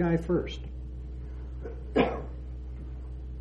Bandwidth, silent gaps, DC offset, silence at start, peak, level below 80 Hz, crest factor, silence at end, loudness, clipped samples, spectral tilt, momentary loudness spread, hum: 7.6 kHz; none; under 0.1%; 0 s; -12 dBFS; -38 dBFS; 20 dB; 0 s; -34 LUFS; under 0.1%; -8 dB/octave; 14 LU; none